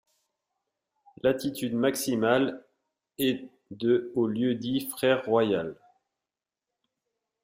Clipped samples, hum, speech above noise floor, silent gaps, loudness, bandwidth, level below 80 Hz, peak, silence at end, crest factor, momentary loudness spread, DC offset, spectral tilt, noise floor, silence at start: under 0.1%; none; 64 dB; none; -27 LUFS; 16 kHz; -68 dBFS; -10 dBFS; 1.7 s; 20 dB; 7 LU; under 0.1%; -5 dB/octave; -90 dBFS; 1.25 s